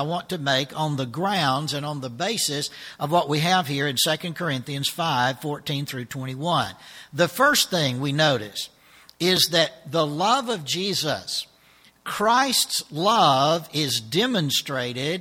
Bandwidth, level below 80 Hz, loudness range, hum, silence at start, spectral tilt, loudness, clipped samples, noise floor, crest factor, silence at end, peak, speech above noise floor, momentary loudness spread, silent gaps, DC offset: 18 kHz; -64 dBFS; 3 LU; none; 0 s; -3.5 dB/octave; -23 LUFS; under 0.1%; -56 dBFS; 20 dB; 0 s; -4 dBFS; 32 dB; 12 LU; none; under 0.1%